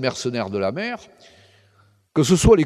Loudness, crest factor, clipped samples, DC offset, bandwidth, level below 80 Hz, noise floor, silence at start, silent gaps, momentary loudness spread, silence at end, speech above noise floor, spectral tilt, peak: -21 LUFS; 18 dB; under 0.1%; under 0.1%; 14 kHz; -34 dBFS; -58 dBFS; 0 s; none; 13 LU; 0 s; 39 dB; -5.5 dB/octave; -2 dBFS